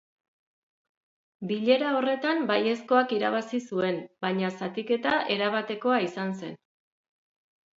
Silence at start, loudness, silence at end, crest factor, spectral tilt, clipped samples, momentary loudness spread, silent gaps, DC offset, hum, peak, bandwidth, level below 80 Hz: 1.4 s; -27 LUFS; 1.2 s; 20 dB; -6 dB/octave; under 0.1%; 9 LU; none; under 0.1%; none; -8 dBFS; 7.8 kHz; -76 dBFS